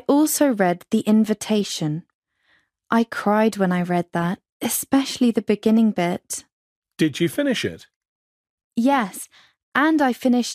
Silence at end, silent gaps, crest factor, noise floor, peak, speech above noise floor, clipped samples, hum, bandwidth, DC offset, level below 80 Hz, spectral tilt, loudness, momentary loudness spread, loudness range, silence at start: 0 s; 2.14-2.22 s, 4.52-4.60 s, 6.53-6.82 s, 7.96-8.01 s, 8.08-8.58 s, 8.64-8.70 s, 9.63-9.72 s; 18 dB; -64 dBFS; -4 dBFS; 44 dB; under 0.1%; none; 15.5 kHz; under 0.1%; -64 dBFS; -5 dB/octave; -21 LUFS; 10 LU; 4 LU; 0.1 s